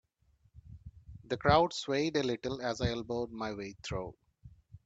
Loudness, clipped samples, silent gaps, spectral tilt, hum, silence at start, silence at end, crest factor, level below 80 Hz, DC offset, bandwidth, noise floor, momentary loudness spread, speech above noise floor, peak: -33 LUFS; under 0.1%; none; -5.5 dB/octave; none; 0.55 s; 0.1 s; 22 dB; -54 dBFS; under 0.1%; 8.8 kHz; -70 dBFS; 23 LU; 38 dB; -12 dBFS